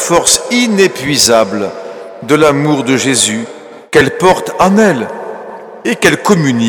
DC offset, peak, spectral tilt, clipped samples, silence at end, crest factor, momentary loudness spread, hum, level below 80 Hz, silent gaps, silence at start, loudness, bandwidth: under 0.1%; 0 dBFS; -3.5 dB/octave; 0.3%; 0 s; 12 dB; 17 LU; none; -44 dBFS; none; 0 s; -10 LUFS; 20 kHz